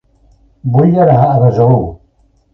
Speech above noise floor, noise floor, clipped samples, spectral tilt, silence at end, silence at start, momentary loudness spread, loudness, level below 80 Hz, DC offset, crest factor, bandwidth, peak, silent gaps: 44 dB; -53 dBFS; under 0.1%; -11.5 dB/octave; 0.6 s; 0.65 s; 11 LU; -10 LUFS; -38 dBFS; under 0.1%; 12 dB; 5.8 kHz; 0 dBFS; none